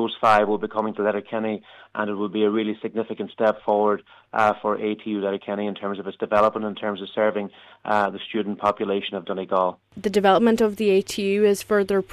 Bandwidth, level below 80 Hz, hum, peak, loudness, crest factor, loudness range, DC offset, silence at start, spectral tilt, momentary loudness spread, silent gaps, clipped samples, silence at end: 14 kHz; -62 dBFS; none; -6 dBFS; -23 LUFS; 16 dB; 4 LU; under 0.1%; 0 s; -5.5 dB/octave; 11 LU; none; under 0.1%; 0 s